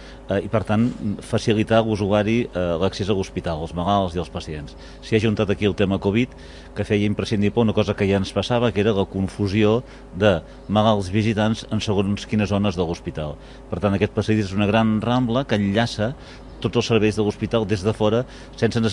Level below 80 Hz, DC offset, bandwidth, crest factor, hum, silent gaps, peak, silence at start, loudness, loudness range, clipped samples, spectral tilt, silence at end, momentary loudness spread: -42 dBFS; under 0.1%; 11 kHz; 18 dB; none; none; -2 dBFS; 0 s; -21 LUFS; 2 LU; under 0.1%; -6.5 dB/octave; 0 s; 10 LU